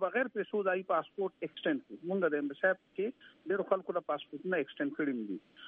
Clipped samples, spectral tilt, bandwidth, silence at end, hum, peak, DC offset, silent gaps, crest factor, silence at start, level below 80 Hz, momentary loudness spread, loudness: under 0.1%; -8.5 dB/octave; 3.9 kHz; 0 s; none; -14 dBFS; under 0.1%; none; 20 dB; 0 s; -86 dBFS; 7 LU; -35 LUFS